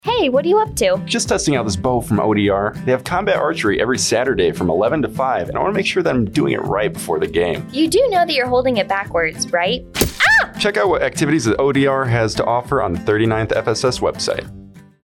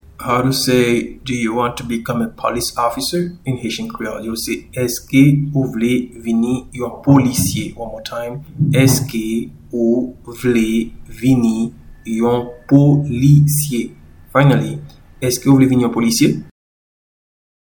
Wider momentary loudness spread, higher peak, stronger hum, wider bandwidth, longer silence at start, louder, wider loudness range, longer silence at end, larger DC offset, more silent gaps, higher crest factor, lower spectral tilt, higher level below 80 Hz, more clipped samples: second, 5 LU vs 13 LU; second, -6 dBFS vs 0 dBFS; neither; second, 17.5 kHz vs 19.5 kHz; second, 0.05 s vs 0.2 s; about the same, -17 LUFS vs -16 LUFS; about the same, 2 LU vs 4 LU; second, 0.25 s vs 1.3 s; neither; neither; about the same, 12 dB vs 16 dB; about the same, -4.5 dB/octave vs -5.5 dB/octave; about the same, -40 dBFS vs -42 dBFS; neither